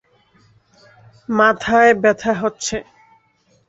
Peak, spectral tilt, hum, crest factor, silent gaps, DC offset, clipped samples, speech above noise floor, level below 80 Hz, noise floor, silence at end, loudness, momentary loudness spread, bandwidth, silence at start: -2 dBFS; -4 dB/octave; none; 18 dB; none; under 0.1%; under 0.1%; 44 dB; -52 dBFS; -59 dBFS; 0.85 s; -16 LUFS; 13 LU; 8 kHz; 1.3 s